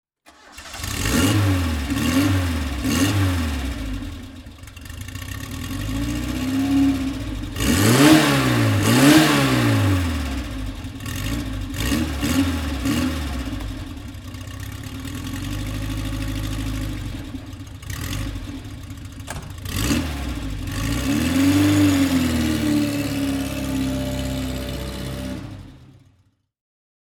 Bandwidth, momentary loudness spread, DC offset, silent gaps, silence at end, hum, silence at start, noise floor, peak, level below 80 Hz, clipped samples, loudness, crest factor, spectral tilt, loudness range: 19 kHz; 18 LU; under 0.1%; none; 1.2 s; none; 0.45 s; -62 dBFS; 0 dBFS; -32 dBFS; under 0.1%; -21 LUFS; 22 dB; -5 dB/octave; 13 LU